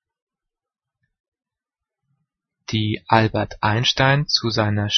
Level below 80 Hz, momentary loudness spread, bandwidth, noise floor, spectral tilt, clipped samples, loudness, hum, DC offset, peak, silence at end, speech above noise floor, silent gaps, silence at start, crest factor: -50 dBFS; 7 LU; 6.4 kHz; -87 dBFS; -5 dB/octave; under 0.1%; -19 LUFS; none; under 0.1%; 0 dBFS; 0 s; 68 dB; none; 2.7 s; 22 dB